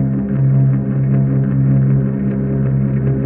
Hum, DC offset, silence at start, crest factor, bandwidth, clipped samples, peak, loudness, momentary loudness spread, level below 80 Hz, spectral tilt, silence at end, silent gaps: none; under 0.1%; 0 s; 10 dB; 2.7 kHz; under 0.1%; -4 dBFS; -15 LUFS; 4 LU; -34 dBFS; -13 dB/octave; 0 s; none